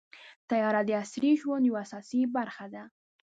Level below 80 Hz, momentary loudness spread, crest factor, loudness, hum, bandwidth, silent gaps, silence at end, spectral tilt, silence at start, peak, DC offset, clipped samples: -80 dBFS; 14 LU; 14 dB; -29 LUFS; none; 9 kHz; 0.36-0.48 s; 0.4 s; -5.5 dB/octave; 0.15 s; -16 dBFS; under 0.1%; under 0.1%